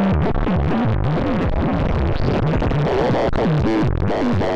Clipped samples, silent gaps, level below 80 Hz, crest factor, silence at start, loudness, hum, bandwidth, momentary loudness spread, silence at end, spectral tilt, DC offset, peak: under 0.1%; none; -26 dBFS; 12 dB; 0 s; -19 LUFS; none; 8 kHz; 2 LU; 0 s; -8.5 dB/octave; under 0.1%; -6 dBFS